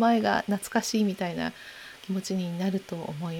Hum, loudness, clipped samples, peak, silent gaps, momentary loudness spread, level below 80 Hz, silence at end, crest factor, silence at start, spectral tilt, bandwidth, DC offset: none; -29 LUFS; under 0.1%; -10 dBFS; none; 12 LU; -64 dBFS; 0 s; 18 dB; 0 s; -5 dB/octave; 19 kHz; under 0.1%